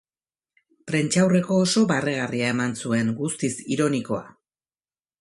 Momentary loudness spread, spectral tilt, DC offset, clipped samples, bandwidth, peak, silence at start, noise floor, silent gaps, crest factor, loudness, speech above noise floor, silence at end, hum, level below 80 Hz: 8 LU; -5 dB/octave; under 0.1%; under 0.1%; 11.5 kHz; -6 dBFS; 0.85 s; under -90 dBFS; none; 18 dB; -23 LUFS; over 68 dB; 0.9 s; none; -64 dBFS